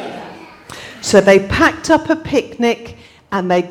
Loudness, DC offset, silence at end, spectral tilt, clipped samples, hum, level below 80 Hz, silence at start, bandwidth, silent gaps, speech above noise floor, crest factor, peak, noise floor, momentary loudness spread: -14 LUFS; under 0.1%; 0 s; -4.5 dB/octave; under 0.1%; none; -42 dBFS; 0 s; 17 kHz; none; 22 dB; 16 dB; 0 dBFS; -35 dBFS; 22 LU